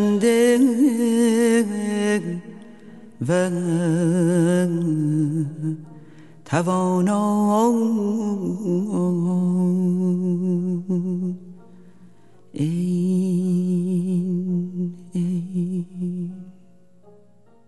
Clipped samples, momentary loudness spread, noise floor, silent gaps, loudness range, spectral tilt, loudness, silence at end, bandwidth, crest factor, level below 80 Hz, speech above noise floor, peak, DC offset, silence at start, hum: under 0.1%; 11 LU; -55 dBFS; none; 4 LU; -7 dB/octave; -21 LUFS; 1.15 s; 12 kHz; 16 dB; -70 dBFS; 36 dB; -4 dBFS; 0.4%; 0 s; none